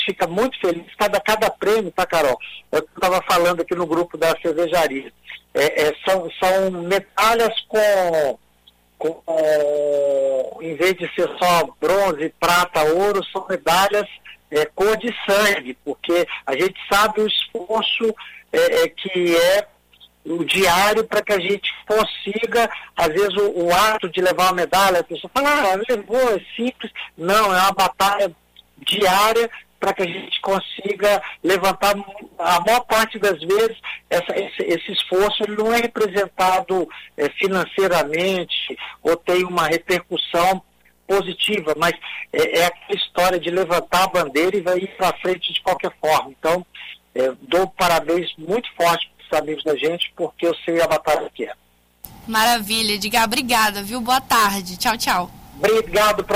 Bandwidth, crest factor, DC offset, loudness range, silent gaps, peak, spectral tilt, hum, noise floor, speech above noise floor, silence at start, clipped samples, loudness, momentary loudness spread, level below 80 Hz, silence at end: 16 kHz; 14 dB; under 0.1%; 2 LU; none; -6 dBFS; -3 dB/octave; none; -55 dBFS; 36 dB; 0 s; under 0.1%; -19 LUFS; 8 LU; -50 dBFS; 0 s